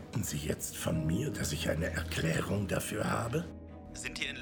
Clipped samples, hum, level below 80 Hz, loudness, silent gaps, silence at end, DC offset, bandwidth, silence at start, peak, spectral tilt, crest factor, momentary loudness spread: under 0.1%; none; -48 dBFS; -34 LUFS; none; 0 s; under 0.1%; over 20 kHz; 0 s; -16 dBFS; -4.5 dB/octave; 18 dB; 8 LU